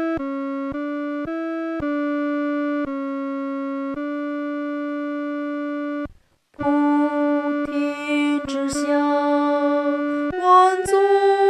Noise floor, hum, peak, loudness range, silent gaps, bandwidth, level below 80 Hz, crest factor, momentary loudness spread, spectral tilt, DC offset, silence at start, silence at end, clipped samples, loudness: -52 dBFS; none; -4 dBFS; 7 LU; none; 12 kHz; -54 dBFS; 18 dB; 10 LU; -4.5 dB/octave; under 0.1%; 0 s; 0 s; under 0.1%; -22 LUFS